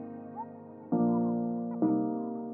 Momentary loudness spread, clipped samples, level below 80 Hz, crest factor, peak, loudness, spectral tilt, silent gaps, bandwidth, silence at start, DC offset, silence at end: 15 LU; under 0.1%; -82 dBFS; 14 dB; -16 dBFS; -31 LUFS; -13.5 dB/octave; none; 2 kHz; 0 s; under 0.1%; 0 s